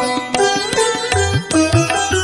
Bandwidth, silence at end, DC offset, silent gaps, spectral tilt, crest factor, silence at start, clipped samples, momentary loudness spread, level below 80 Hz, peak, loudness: 11.5 kHz; 0 s; under 0.1%; none; -4 dB/octave; 16 dB; 0 s; under 0.1%; 2 LU; -40 dBFS; 0 dBFS; -15 LUFS